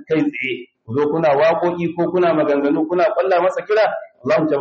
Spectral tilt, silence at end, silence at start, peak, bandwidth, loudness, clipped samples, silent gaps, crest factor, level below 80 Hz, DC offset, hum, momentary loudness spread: -5 dB/octave; 0 s; 0 s; -6 dBFS; 7.4 kHz; -18 LUFS; under 0.1%; none; 12 dB; -62 dBFS; under 0.1%; none; 8 LU